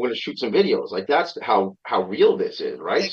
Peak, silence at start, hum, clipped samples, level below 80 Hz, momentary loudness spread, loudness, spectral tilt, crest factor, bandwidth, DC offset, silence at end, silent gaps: -6 dBFS; 0 s; none; under 0.1%; -72 dBFS; 7 LU; -22 LUFS; -5.5 dB/octave; 16 dB; 7 kHz; under 0.1%; 0 s; none